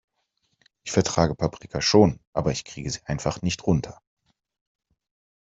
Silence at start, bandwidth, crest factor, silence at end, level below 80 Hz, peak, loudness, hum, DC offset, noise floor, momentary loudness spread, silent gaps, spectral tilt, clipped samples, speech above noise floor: 0.85 s; 8.2 kHz; 22 dB; 1.45 s; -48 dBFS; -4 dBFS; -24 LUFS; none; under 0.1%; -74 dBFS; 13 LU; 2.27-2.33 s; -5 dB/octave; under 0.1%; 50 dB